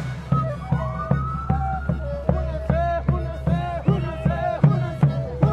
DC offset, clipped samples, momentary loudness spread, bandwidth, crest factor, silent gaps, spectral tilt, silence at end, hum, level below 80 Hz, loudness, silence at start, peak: under 0.1%; under 0.1%; 5 LU; 6.2 kHz; 18 dB; none; -9.5 dB/octave; 0 s; none; -32 dBFS; -23 LUFS; 0 s; -4 dBFS